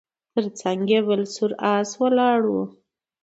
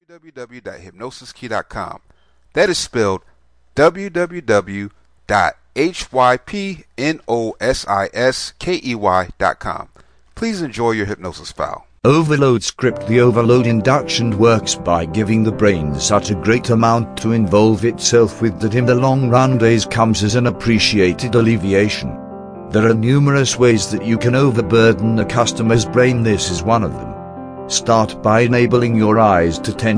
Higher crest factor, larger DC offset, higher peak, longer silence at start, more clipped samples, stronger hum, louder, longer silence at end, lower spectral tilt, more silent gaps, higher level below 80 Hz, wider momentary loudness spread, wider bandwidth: about the same, 16 dB vs 16 dB; neither; second, -6 dBFS vs 0 dBFS; first, 0.35 s vs 0.15 s; neither; neither; second, -22 LUFS vs -15 LUFS; first, 0.55 s vs 0 s; about the same, -5 dB/octave vs -5.5 dB/octave; neither; second, -72 dBFS vs -40 dBFS; second, 8 LU vs 14 LU; second, 8 kHz vs 10.5 kHz